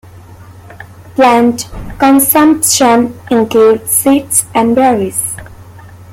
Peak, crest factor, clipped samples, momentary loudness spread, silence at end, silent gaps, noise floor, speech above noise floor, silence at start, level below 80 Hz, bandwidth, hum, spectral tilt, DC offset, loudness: 0 dBFS; 12 dB; under 0.1%; 11 LU; 0 s; none; -34 dBFS; 24 dB; 0.15 s; -40 dBFS; 17 kHz; none; -3.5 dB/octave; under 0.1%; -9 LUFS